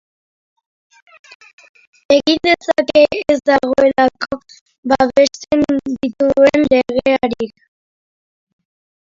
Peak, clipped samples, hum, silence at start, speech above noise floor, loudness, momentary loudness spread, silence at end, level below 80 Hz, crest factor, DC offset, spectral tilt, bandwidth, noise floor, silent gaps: 0 dBFS; under 0.1%; none; 2.1 s; over 76 dB; -14 LUFS; 12 LU; 1.6 s; -48 dBFS; 16 dB; under 0.1%; -4.5 dB/octave; 7.6 kHz; under -90 dBFS; 4.61-4.66 s, 4.78-4.83 s